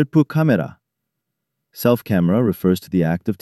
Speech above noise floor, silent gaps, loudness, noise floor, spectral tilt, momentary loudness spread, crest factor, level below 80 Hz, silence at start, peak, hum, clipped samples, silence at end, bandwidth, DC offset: 61 dB; none; -18 LUFS; -79 dBFS; -8 dB/octave; 5 LU; 16 dB; -52 dBFS; 0 s; -2 dBFS; none; under 0.1%; 0.1 s; 14 kHz; under 0.1%